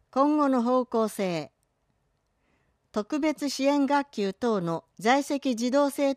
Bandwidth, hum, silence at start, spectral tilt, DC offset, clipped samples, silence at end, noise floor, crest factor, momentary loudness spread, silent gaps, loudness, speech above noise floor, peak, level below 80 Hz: 15 kHz; none; 0.15 s; -5 dB/octave; under 0.1%; under 0.1%; 0 s; -73 dBFS; 16 dB; 9 LU; none; -26 LUFS; 48 dB; -10 dBFS; -72 dBFS